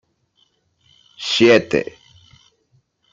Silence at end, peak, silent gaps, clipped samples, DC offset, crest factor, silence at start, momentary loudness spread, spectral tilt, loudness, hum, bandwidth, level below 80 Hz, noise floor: 1.3 s; -2 dBFS; none; under 0.1%; under 0.1%; 20 dB; 1.2 s; 17 LU; -4.5 dB/octave; -16 LUFS; none; 7.8 kHz; -58 dBFS; -63 dBFS